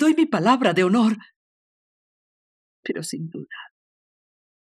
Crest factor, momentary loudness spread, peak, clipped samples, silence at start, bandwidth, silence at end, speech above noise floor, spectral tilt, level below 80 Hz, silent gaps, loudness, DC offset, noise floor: 20 dB; 18 LU; -4 dBFS; under 0.1%; 0 s; 13 kHz; 1 s; over 70 dB; -5.5 dB/octave; -76 dBFS; 1.36-2.83 s; -21 LUFS; under 0.1%; under -90 dBFS